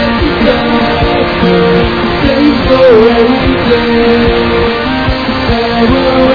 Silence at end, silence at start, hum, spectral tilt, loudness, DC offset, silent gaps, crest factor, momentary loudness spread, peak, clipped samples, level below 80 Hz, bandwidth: 0 s; 0 s; none; -7.5 dB/octave; -8 LUFS; 0.5%; none; 8 dB; 6 LU; 0 dBFS; 1%; -22 dBFS; 5.4 kHz